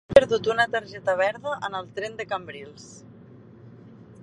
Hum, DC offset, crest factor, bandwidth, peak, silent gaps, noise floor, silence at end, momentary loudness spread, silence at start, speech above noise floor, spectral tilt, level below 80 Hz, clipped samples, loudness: none; under 0.1%; 26 dB; 10.5 kHz; 0 dBFS; none; -48 dBFS; 0 s; 23 LU; 0.1 s; 24 dB; -4.5 dB/octave; -54 dBFS; under 0.1%; -25 LUFS